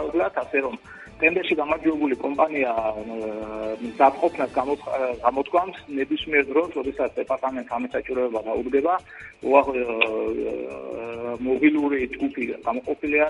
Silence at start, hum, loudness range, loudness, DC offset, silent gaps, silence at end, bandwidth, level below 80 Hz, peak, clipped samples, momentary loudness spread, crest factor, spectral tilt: 0 s; none; 2 LU; -24 LUFS; under 0.1%; none; 0 s; 11 kHz; -54 dBFS; -2 dBFS; under 0.1%; 11 LU; 22 dB; -6 dB/octave